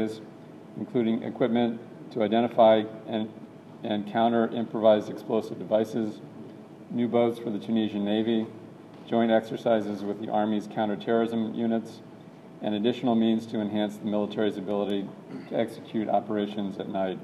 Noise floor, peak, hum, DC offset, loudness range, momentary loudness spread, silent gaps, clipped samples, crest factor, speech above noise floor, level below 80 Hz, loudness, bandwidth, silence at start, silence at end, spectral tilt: -47 dBFS; -8 dBFS; none; under 0.1%; 4 LU; 19 LU; none; under 0.1%; 20 dB; 20 dB; -76 dBFS; -27 LUFS; 12 kHz; 0 s; 0 s; -7.5 dB/octave